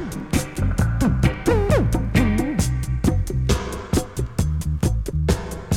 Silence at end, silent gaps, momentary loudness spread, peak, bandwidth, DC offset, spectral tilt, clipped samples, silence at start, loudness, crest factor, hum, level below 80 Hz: 0 s; none; 5 LU; -6 dBFS; 17 kHz; under 0.1%; -6 dB/octave; under 0.1%; 0 s; -22 LUFS; 14 dB; none; -26 dBFS